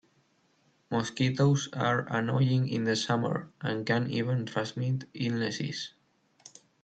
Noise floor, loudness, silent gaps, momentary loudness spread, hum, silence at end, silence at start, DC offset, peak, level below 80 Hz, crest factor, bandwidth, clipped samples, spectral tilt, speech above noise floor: -69 dBFS; -30 LUFS; none; 8 LU; none; 0.35 s; 0.9 s; under 0.1%; -12 dBFS; -68 dBFS; 18 dB; 8.6 kHz; under 0.1%; -6 dB/octave; 40 dB